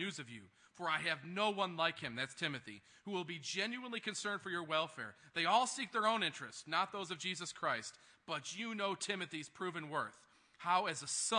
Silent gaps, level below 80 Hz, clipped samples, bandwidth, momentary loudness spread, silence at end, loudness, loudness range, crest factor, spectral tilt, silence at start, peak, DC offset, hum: none; -86 dBFS; under 0.1%; 10.5 kHz; 12 LU; 0 s; -39 LUFS; 4 LU; 22 dB; -2.5 dB/octave; 0 s; -18 dBFS; under 0.1%; none